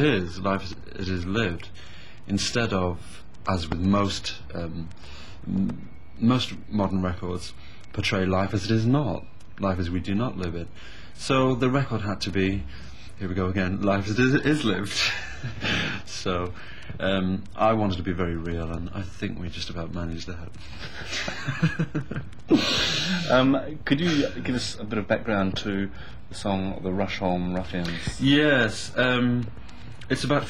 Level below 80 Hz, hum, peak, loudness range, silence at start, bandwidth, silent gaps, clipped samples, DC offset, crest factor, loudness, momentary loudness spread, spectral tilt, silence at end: -42 dBFS; none; -6 dBFS; 5 LU; 0 s; 16 kHz; none; under 0.1%; 2%; 20 dB; -26 LUFS; 16 LU; -5.5 dB/octave; 0 s